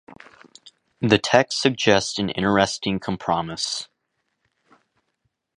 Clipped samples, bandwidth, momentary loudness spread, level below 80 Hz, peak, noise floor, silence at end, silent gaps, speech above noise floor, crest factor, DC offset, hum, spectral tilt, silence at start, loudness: under 0.1%; 11.5 kHz; 9 LU; -54 dBFS; 0 dBFS; -75 dBFS; 1.75 s; none; 54 dB; 24 dB; under 0.1%; none; -4 dB/octave; 0.1 s; -21 LUFS